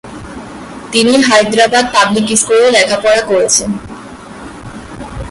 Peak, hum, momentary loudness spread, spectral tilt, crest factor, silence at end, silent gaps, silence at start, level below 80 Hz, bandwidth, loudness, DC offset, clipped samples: 0 dBFS; none; 21 LU; -2.5 dB/octave; 12 dB; 0 s; none; 0.05 s; -38 dBFS; 11.5 kHz; -10 LUFS; under 0.1%; under 0.1%